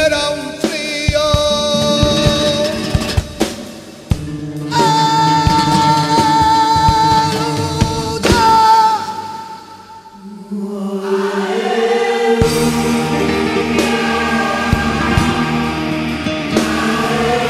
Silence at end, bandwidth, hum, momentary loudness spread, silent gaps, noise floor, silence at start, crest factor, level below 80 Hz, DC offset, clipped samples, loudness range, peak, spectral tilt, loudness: 0 s; 15.5 kHz; none; 11 LU; none; -36 dBFS; 0 s; 14 dB; -32 dBFS; under 0.1%; under 0.1%; 4 LU; 0 dBFS; -4.5 dB/octave; -14 LUFS